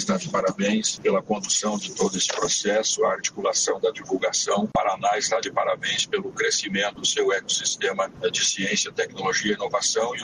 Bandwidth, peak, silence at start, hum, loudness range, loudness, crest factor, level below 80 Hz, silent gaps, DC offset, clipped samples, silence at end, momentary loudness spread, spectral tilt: 10.5 kHz; -10 dBFS; 0 s; none; 1 LU; -23 LUFS; 14 dB; -62 dBFS; none; under 0.1%; under 0.1%; 0 s; 4 LU; -2 dB/octave